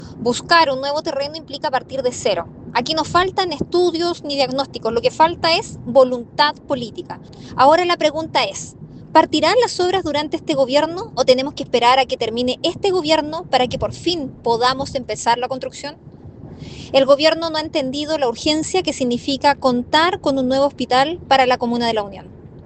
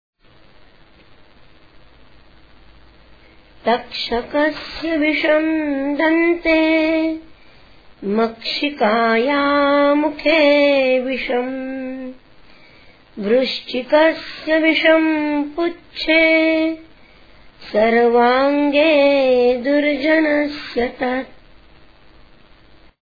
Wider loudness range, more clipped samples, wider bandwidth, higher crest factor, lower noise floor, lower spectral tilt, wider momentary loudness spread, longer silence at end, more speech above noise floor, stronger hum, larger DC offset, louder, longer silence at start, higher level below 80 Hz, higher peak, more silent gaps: second, 3 LU vs 6 LU; neither; first, 9 kHz vs 5 kHz; about the same, 18 dB vs 18 dB; second, -37 dBFS vs -49 dBFS; second, -4 dB/octave vs -6 dB/octave; about the same, 11 LU vs 12 LU; second, 0.05 s vs 1.85 s; second, 19 dB vs 33 dB; neither; second, under 0.1% vs 0.4%; about the same, -18 LUFS vs -17 LUFS; second, 0 s vs 3.65 s; about the same, -50 dBFS vs -48 dBFS; about the same, 0 dBFS vs 0 dBFS; neither